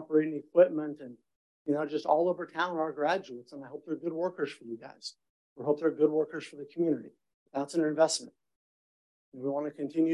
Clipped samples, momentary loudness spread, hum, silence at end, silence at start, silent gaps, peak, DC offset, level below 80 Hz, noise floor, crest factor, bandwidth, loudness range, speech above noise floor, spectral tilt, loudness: under 0.1%; 17 LU; none; 0 s; 0 s; 1.36-1.65 s, 5.30-5.56 s, 7.34-7.46 s, 8.56-9.32 s; -10 dBFS; under 0.1%; -86 dBFS; under -90 dBFS; 22 dB; 11.5 kHz; 4 LU; over 60 dB; -5 dB/octave; -31 LUFS